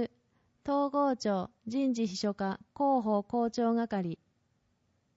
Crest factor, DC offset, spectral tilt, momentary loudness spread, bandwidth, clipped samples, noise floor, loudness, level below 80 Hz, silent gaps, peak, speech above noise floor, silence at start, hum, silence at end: 14 dB; under 0.1%; -6 dB/octave; 8 LU; 8 kHz; under 0.1%; -75 dBFS; -32 LUFS; -70 dBFS; none; -18 dBFS; 44 dB; 0 s; none; 1 s